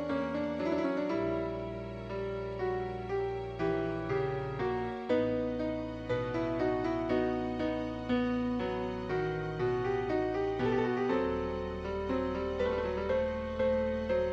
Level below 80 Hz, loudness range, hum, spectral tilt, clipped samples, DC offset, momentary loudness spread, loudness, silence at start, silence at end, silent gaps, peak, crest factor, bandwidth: -50 dBFS; 2 LU; none; -8 dB/octave; under 0.1%; under 0.1%; 6 LU; -33 LUFS; 0 s; 0 s; none; -18 dBFS; 14 dB; 7.8 kHz